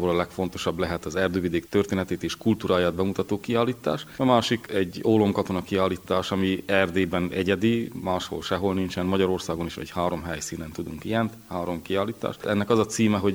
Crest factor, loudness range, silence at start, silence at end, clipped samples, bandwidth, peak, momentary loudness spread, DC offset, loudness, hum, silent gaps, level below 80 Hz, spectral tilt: 20 dB; 4 LU; 0 s; 0 s; under 0.1%; over 20 kHz; -4 dBFS; 8 LU; under 0.1%; -26 LUFS; none; none; -52 dBFS; -5.5 dB/octave